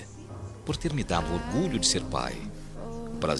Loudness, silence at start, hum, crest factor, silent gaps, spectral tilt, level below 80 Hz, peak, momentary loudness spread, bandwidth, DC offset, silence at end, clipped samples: -29 LUFS; 0 s; none; 22 dB; none; -4 dB/octave; -42 dBFS; -8 dBFS; 17 LU; 12.5 kHz; under 0.1%; 0 s; under 0.1%